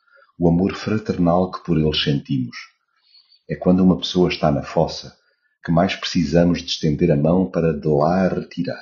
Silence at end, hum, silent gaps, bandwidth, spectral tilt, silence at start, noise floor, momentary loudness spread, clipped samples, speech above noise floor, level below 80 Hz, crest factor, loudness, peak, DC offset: 0 s; none; none; 7.2 kHz; -6 dB/octave; 0.4 s; -56 dBFS; 8 LU; under 0.1%; 38 dB; -42 dBFS; 16 dB; -19 LUFS; -2 dBFS; under 0.1%